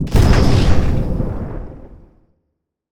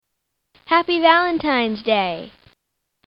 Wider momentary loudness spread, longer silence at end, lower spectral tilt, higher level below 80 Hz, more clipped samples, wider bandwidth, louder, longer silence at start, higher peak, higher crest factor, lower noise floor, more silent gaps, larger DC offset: first, 17 LU vs 7 LU; first, 0.95 s vs 0.8 s; about the same, -7 dB/octave vs -7 dB/octave; first, -20 dBFS vs -56 dBFS; neither; first, 15 kHz vs 5.8 kHz; about the same, -16 LUFS vs -18 LUFS; second, 0 s vs 0.7 s; about the same, 0 dBFS vs 0 dBFS; second, 14 dB vs 20 dB; about the same, -73 dBFS vs -76 dBFS; neither; neither